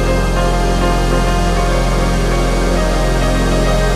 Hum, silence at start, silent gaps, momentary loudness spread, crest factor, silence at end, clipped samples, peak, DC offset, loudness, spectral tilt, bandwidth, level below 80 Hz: none; 0 s; none; 1 LU; 10 dB; 0 s; under 0.1%; -4 dBFS; under 0.1%; -15 LUFS; -5.5 dB/octave; 13.5 kHz; -16 dBFS